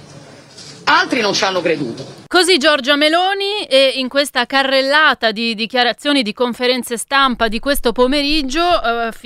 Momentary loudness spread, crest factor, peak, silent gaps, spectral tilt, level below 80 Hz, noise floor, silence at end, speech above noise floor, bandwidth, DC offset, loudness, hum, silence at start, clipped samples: 7 LU; 16 dB; 0 dBFS; none; -2.5 dB/octave; -36 dBFS; -39 dBFS; 0.05 s; 24 dB; 16 kHz; under 0.1%; -14 LUFS; none; 0 s; under 0.1%